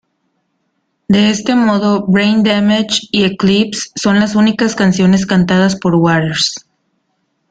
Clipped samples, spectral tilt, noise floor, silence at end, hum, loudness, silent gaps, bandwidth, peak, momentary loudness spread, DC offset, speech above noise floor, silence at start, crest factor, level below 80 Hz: under 0.1%; -5 dB/octave; -66 dBFS; 0.9 s; none; -12 LUFS; none; 9.2 kHz; 0 dBFS; 4 LU; under 0.1%; 54 dB; 1.1 s; 12 dB; -48 dBFS